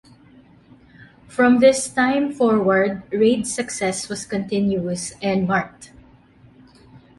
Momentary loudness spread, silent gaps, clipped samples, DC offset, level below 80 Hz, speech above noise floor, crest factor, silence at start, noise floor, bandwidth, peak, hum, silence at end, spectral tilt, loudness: 11 LU; none; under 0.1%; under 0.1%; -54 dBFS; 31 dB; 18 dB; 1 s; -50 dBFS; 11.5 kHz; -2 dBFS; none; 0.2 s; -5 dB/octave; -20 LUFS